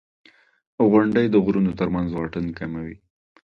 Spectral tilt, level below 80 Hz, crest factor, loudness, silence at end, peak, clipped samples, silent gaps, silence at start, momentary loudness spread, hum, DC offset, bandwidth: -9.5 dB/octave; -48 dBFS; 18 dB; -21 LUFS; 0.6 s; -4 dBFS; under 0.1%; none; 0.8 s; 13 LU; none; under 0.1%; 5.8 kHz